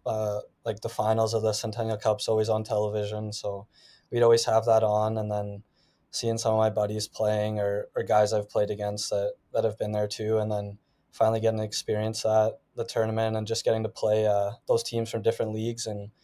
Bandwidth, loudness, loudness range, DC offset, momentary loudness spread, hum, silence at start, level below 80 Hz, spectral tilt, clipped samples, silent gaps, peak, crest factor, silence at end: 16 kHz; -27 LUFS; 3 LU; under 0.1%; 9 LU; none; 0.05 s; -62 dBFS; -5 dB/octave; under 0.1%; none; -10 dBFS; 16 dB; 0.15 s